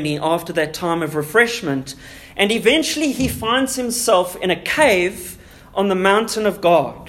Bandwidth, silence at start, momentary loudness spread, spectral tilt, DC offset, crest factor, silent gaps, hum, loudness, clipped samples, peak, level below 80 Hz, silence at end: 16.5 kHz; 0 s; 10 LU; -3.5 dB/octave; under 0.1%; 18 dB; none; none; -18 LUFS; under 0.1%; 0 dBFS; -46 dBFS; 0 s